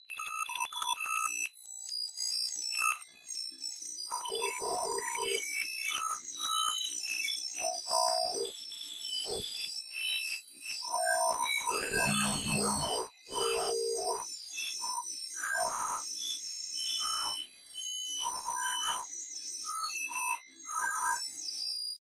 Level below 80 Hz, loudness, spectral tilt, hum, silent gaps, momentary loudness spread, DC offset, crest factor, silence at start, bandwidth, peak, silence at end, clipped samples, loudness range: -66 dBFS; -33 LUFS; -0.5 dB/octave; none; none; 9 LU; under 0.1%; 20 dB; 0.1 s; 16 kHz; -16 dBFS; 0.05 s; under 0.1%; 3 LU